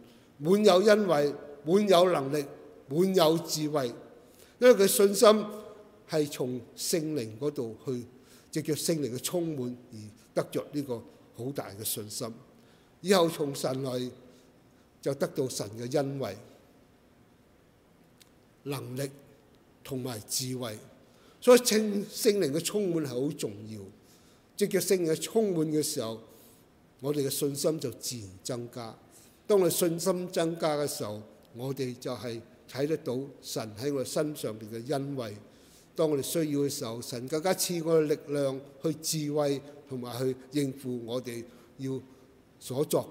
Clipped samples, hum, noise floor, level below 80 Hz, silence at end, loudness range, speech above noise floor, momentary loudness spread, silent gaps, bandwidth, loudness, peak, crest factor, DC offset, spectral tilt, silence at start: under 0.1%; none; -61 dBFS; -72 dBFS; 0 s; 10 LU; 33 dB; 17 LU; none; 16 kHz; -29 LUFS; -6 dBFS; 24 dB; under 0.1%; -4.5 dB/octave; 0 s